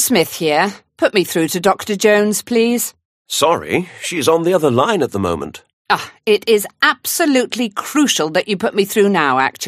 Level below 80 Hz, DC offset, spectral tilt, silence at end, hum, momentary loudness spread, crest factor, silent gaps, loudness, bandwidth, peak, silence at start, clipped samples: -56 dBFS; under 0.1%; -3.5 dB/octave; 0 s; none; 7 LU; 16 dB; 3.05-3.25 s, 5.73-5.85 s; -16 LUFS; 15.5 kHz; 0 dBFS; 0 s; under 0.1%